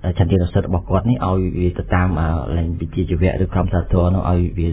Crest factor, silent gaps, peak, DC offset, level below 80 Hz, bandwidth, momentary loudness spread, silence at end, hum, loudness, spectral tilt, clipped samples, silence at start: 16 dB; none; -2 dBFS; under 0.1%; -24 dBFS; 4 kHz; 4 LU; 0 s; none; -19 LUFS; -12.5 dB/octave; under 0.1%; 0 s